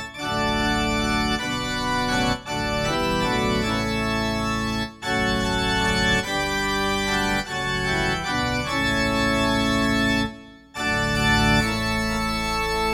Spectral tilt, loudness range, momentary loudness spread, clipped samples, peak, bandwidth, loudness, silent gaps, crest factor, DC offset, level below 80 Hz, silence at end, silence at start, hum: -4 dB/octave; 2 LU; 5 LU; under 0.1%; -6 dBFS; 17 kHz; -22 LUFS; none; 16 dB; under 0.1%; -36 dBFS; 0 s; 0 s; none